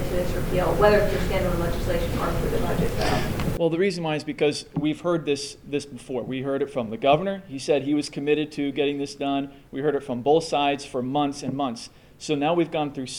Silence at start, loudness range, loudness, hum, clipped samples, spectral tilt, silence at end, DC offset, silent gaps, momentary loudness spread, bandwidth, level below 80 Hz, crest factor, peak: 0 s; 2 LU; -25 LUFS; none; under 0.1%; -5.5 dB/octave; 0 s; under 0.1%; none; 9 LU; over 20 kHz; -36 dBFS; 20 dB; -4 dBFS